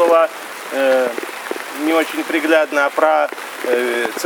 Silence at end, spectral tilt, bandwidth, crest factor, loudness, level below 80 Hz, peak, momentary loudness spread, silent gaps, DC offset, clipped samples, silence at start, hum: 0 s; -2 dB/octave; over 20 kHz; 16 dB; -17 LUFS; -76 dBFS; -2 dBFS; 11 LU; none; under 0.1%; under 0.1%; 0 s; none